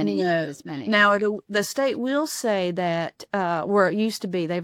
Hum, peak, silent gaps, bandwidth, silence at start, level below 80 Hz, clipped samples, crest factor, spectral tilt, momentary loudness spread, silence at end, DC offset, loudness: none; -6 dBFS; none; 17.5 kHz; 0 s; -70 dBFS; under 0.1%; 16 dB; -4.5 dB/octave; 9 LU; 0 s; under 0.1%; -23 LUFS